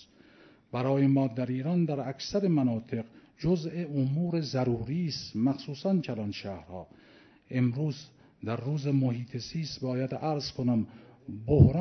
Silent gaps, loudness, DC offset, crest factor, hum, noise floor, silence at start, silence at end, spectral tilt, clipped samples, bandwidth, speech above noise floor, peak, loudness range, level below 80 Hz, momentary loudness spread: none; -30 LUFS; under 0.1%; 24 dB; none; -58 dBFS; 0.75 s; 0 s; -7.5 dB/octave; under 0.1%; 6.4 kHz; 29 dB; -6 dBFS; 4 LU; -52 dBFS; 13 LU